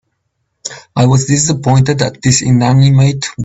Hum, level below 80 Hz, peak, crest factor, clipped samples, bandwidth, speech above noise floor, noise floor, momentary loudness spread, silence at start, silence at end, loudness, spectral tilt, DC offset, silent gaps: none; -42 dBFS; 0 dBFS; 12 dB; under 0.1%; 8.2 kHz; 57 dB; -67 dBFS; 14 LU; 0.65 s; 0 s; -11 LUFS; -5 dB/octave; under 0.1%; none